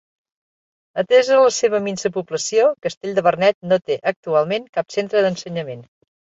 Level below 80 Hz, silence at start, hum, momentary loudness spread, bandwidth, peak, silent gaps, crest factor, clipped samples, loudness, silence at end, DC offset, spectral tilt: -66 dBFS; 0.95 s; none; 12 LU; 8 kHz; -2 dBFS; 2.97-3.01 s, 3.54-3.61 s, 4.16-4.23 s, 4.69-4.73 s; 18 dB; under 0.1%; -19 LUFS; 0.55 s; under 0.1%; -4 dB/octave